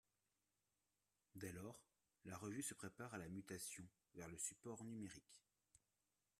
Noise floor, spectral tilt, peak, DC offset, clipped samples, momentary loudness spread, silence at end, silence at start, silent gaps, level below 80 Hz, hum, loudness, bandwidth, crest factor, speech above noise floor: under -90 dBFS; -4 dB/octave; -34 dBFS; under 0.1%; under 0.1%; 13 LU; 0.6 s; 1.35 s; none; -82 dBFS; 50 Hz at -80 dBFS; -54 LUFS; 15 kHz; 22 dB; over 36 dB